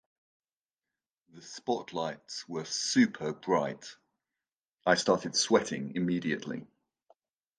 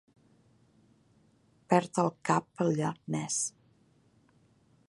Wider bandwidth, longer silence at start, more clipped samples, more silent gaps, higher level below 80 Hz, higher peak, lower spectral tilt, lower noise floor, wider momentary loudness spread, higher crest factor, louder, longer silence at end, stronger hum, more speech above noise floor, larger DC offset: second, 10 kHz vs 11.5 kHz; second, 1.35 s vs 1.7 s; neither; first, 4.73-4.77 s vs none; about the same, -72 dBFS vs -76 dBFS; about the same, -8 dBFS vs -8 dBFS; second, -3.5 dB/octave vs -5 dB/octave; first, under -90 dBFS vs -66 dBFS; first, 15 LU vs 6 LU; about the same, 24 dB vs 26 dB; about the same, -30 LUFS vs -31 LUFS; second, 0.95 s vs 1.4 s; neither; first, over 59 dB vs 36 dB; neither